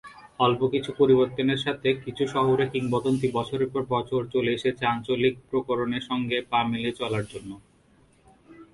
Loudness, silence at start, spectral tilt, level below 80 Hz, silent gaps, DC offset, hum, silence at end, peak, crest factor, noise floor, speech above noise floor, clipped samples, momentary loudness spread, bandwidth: -25 LUFS; 0.05 s; -6.5 dB/octave; -58 dBFS; none; under 0.1%; none; 0.1 s; -8 dBFS; 18 dB; -60 dBFS; 35 dB; under 0.1%; 7 LU; 11.5 kHz